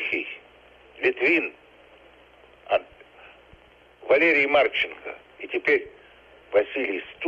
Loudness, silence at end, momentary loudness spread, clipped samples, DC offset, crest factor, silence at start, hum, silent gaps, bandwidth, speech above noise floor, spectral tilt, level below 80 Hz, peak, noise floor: -23 LUFS; 0 s; 21 LU; under 0.1%; under 0.1%; 18 dB; 0 s; 60 Hz at -70 dBFS; none; 7.6 kHz; 30 dB; -5 dB/octave; -64 dBFS; -8 dBFS; -53 dBFS